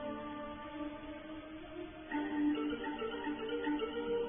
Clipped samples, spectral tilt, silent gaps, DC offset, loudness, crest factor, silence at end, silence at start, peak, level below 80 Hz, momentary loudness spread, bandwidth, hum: under 0.1%; -1.5 dB/octave; none; under 0.1%; -40 LUFS; 14 dB; 0 s; 0 s; -26 dBFS; -62 dBFS; 12 LU; 3.6 kHz; none